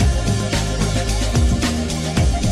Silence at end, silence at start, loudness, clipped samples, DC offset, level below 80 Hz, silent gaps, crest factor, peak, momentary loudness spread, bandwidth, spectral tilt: 0 s; 0 s; -19 LUFS; under 0.1%; under 0.1%; -22 dBFS; none; 12 dB; -6 dBFS; 3 LU; 14 kHz; -5 dB/octave